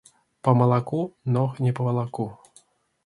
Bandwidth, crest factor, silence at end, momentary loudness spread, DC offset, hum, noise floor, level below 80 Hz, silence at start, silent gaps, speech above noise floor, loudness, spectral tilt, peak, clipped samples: 11 kHz; 20 dB; 0.7 s; 11 LU; under 0.1%; none; -59 dBFS; -62 dBFS; 0.45 s; none; 36 dB; -24 LUFS; -9.5 dB/octave; -4 dBFS; under 0.1%